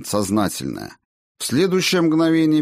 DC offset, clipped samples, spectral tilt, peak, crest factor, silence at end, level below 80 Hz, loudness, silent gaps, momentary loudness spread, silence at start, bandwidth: under 0.1%; under 0.1%; -5 dB/octave; -8 dBFS; 12 dB; 0 s; -56 dBFS; -19 LUFS; 1.05-1.35 s; 13 LU; 0 s; 15.5 kHz